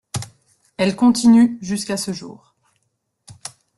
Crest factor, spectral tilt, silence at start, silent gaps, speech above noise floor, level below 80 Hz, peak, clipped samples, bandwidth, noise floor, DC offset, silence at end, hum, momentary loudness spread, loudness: 16 dB; -5 dB/octave; 0.15 s; none; 55 dB; -58 dBFS; -4 dBFS; under 0.1%; 12 kHz; -72 dBFS; under 0.1%; 0.3 s; none; 24 LU; -17 LUFS